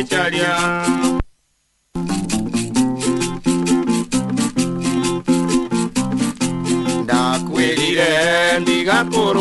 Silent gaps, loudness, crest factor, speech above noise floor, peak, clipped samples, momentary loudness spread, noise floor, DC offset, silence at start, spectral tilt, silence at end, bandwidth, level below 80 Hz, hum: none; -18 LUFS; 16 dB; 47 dB; -2 dBFS; under 0.1%; 6 LU; -65 dBFS; under 0.1%; 0 s; -4 dB/octave; 0 s; 12 kHz; -40 dBFS; none